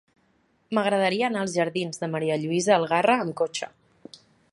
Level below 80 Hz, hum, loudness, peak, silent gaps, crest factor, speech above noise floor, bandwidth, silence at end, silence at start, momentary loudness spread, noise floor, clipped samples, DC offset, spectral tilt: -72 dBFS; none; -24 LUFS; -6 dBFS; none; 18 dB; 42 dB; 11.5 kHz; 0.85 s; 0.7 s; 8 LU; -66 dBFS; under 0.1%; under 0.1%; -4.5 dB/octave